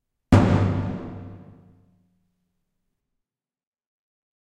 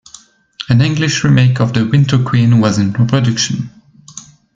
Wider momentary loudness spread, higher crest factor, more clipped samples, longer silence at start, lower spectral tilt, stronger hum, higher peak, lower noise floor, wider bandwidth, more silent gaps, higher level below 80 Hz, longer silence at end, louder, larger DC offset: first, 22 LU vs 19 LU; first, 26 dB vs 12 dB; neither; second, 0.3 s vs 0.6 s; first, -8 dB/octave vs -5.5 dB/octave; neither; about the same, 0 dBFS vs 0 dBFS; first, -86 dBFS vs -42 dBFS; first, 9.4 kHz vs 7.8 kHz; neither; about the same, -42 dBFS vs -46 dBFS; first, 3.05 s vs 0.35 s; second, -21 LUFS vs -12 LUFS; neither